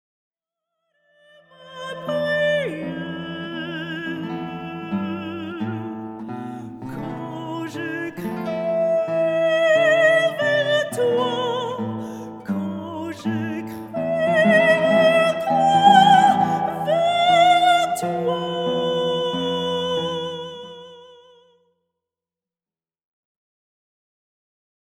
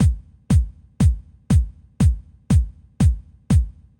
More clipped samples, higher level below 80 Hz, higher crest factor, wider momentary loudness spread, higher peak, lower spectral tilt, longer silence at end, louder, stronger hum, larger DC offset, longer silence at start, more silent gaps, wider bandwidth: neither; second, -64 dBFS vs -24 dBFS; first, 20 dB vs 12 dB; first, 17 LU vs 12 LU; first, -2 dBFS vs -6 dBFS; second, -5 dB/octave vs -7.5 dB/octave; first, 3.95 s vs 0.3 s; about the same, -20 LUFS vs -21 LUFS; neither; neither; first, 1.6 s vs 0 s; neither; second, 15 kHz vs 17 kHz